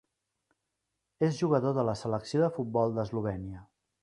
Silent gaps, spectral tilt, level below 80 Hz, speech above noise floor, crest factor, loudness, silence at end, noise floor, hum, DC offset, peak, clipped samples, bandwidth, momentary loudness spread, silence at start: none; -7.5 dB/octave; -60 dBFS; 54 dB; 20 dB; -30 LUFS; 0.4 s; -84 dBFS; none; under 0.1%; -12 dBFS; under 0.1%; 11.5 kHz; 10 LU; 1.2 s